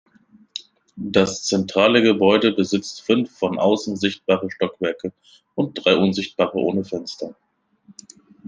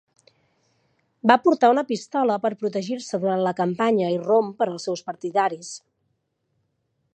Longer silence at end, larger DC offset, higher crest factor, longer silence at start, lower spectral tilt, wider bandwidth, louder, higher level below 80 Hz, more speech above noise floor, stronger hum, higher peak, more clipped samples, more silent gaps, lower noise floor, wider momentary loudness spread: second, 0 s vs 1.35 s; neither; about the same, 20 dB vs 22 dB; second, 0.55 s vs 1.25 s; about the same, -5 dB/octave vs -5.5 dB/octave; about the same, 10 kHz vs 9.6 kHz; about the same, -20 LUFS vs -22 LUFS; first, -62 dBFS vs -76 dBFS; second, 33 dB vs 52 dB; neither; about the same, -2 dBFS vs -2 dBFS; neither; neither; second, -53 dBFS vs -73 dBFS; first, 17 LU vs 12 LU